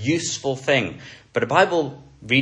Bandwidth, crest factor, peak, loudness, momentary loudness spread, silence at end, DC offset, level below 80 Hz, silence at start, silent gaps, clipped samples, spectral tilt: 10.5 kHz; 20 dB; -2 dBFS; -21 LUFS; 13 LU; 0 s; under 0.1%; -58 dBFS; 0 s; none; under 0.1%; -4 dB/octave